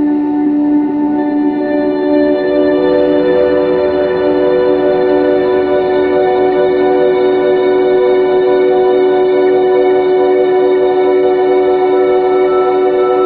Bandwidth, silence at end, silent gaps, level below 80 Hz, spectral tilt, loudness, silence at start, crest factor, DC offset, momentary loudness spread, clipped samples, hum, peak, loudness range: 4.7 kHz; 0 s; none; -46 dBFS; -9 dB/octave; -11 LUFS; 0 s; 10 dB; under 0.1%; 3 LU; under 0.1%; none; 0 dBFS; 2 LU